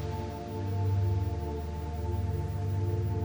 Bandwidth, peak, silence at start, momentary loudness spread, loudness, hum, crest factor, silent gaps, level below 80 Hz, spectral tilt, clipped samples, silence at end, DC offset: over 20 kHz; -20 dBFS; 0 s; 7 LU; -33 LUFS; none; 10 dB; none; -40 dBFS; -8.5 dB/octave; under 0.1%; 0 s; under 0.1%